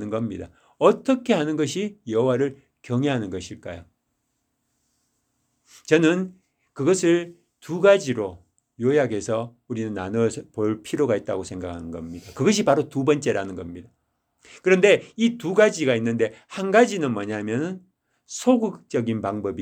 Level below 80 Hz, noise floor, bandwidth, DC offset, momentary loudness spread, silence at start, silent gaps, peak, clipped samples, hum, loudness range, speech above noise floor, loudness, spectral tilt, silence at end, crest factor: -60 dBFS; -75 dBFS; 14.5 kHz; under 0.1%; 16 LU; 0 s; none; -2 dBFS; under 0.1%; none; 6 LU; 52 dB; -23 LUFS; -5.5 dB/octave; 0 s; 22 dB